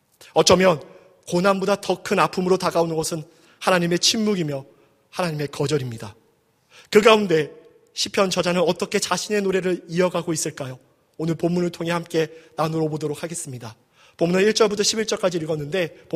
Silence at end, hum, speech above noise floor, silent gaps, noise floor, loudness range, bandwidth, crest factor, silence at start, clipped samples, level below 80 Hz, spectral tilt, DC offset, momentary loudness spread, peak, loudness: 0 s; none; 41 dB; none; -62 dBFS; 5 LU; 15.5 kHz; 22 dB; 0.2 s; under 0.1%; -58 dBFS; -4 dB/octave; under 0.1%; 13 LU; 0 dBFS; -21 LUFS